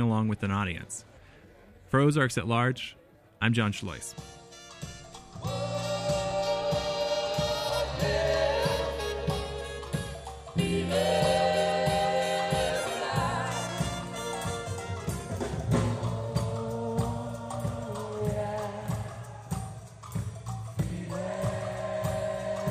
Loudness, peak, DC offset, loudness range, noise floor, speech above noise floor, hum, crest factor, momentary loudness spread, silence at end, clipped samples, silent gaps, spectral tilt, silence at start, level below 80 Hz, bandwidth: -30 LUFS; -12 dBFS; under 0.1%; 7 LU; -54 dBFS; 26 dB; none; 20 dB; 12 LU; 0 s; under 0.1%; none; -5 dB/octave; 0 s; -48 dBFS; 15 kHz